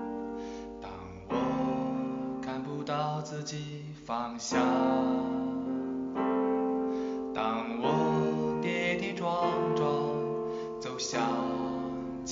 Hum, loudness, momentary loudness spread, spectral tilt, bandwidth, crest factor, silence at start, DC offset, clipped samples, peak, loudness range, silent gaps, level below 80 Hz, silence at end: none; -32 LUFS; 10 LU; -5 dB/octave; 7.4 kHz; 18 dB; 0 s; under 0.1%; under 0.1%; -14 dBFS; 4 LU; none; -62 dBFS; 0 s